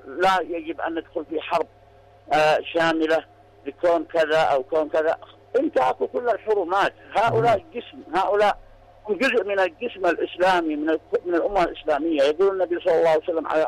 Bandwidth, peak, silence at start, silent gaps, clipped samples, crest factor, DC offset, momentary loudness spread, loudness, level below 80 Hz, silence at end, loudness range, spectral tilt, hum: 13.5 kHz; -12 dBFS; 0.05 s; none; under 0.1%; 10 dB; under 0.1%; 9 LU; -22 LUFS; -54 dBFS; 0 s; 2 LU; -5 dB/octave; none